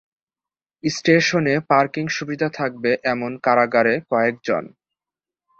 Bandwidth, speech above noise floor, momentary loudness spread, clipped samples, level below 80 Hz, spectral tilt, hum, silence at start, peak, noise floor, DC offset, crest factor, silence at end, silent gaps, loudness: 8 kHz; over 71 dB; 8 LU; under 0.1%; -62 dBFS; -5 dB/octave; none; 0.85 s; -2 dBFS; under -90 dBFS; under 0.1%; 18 dB; 0.9 s; none; -20 LUFS